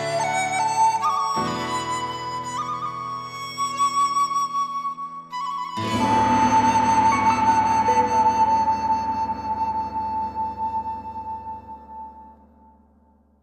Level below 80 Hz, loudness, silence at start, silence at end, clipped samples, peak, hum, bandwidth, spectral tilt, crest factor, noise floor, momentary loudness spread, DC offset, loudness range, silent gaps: -50 dBFS; -22 LUFS; 0 s; 1.1 s; under 0.1%; -8 dBFS; none; 14.5 kHz; -4 dB/octave; 14 dB; -58 dBFS; 14 LU; under 0.1%; 10 LU; none